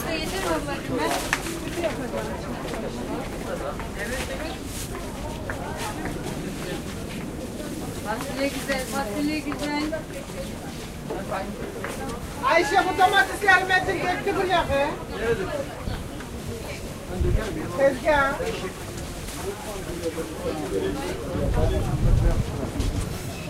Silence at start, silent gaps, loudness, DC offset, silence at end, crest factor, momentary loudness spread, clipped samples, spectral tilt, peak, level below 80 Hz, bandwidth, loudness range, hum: 0 s; none; -26 LUFS; under 0.1%; 0 s; 24 dB; 12 LU; under 0.1%; -5 dB/octave; -2 dBFS; -34 dBFS; 16 kHz; 9 LU; none